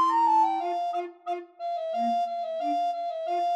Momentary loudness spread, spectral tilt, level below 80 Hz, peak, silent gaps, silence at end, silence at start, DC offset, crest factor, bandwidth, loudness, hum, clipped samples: 12 LU; -4 dB/octave; under -90 dBFS; -14 dBFS; none; 0 s; 0 s; under 0.1%; 12 dB; 8.8 kHz; -28 LUFS; none; under 0.1%